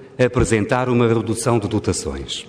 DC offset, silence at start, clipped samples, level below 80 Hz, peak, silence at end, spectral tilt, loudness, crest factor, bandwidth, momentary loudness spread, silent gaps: under 0.1%; 0 s; under 0.1%; -36 dBFS; -2 dBFS; 0 s; -5.5 dB/octave; -19 LUFS; 16 dB; 11 kHz; 6 LU; none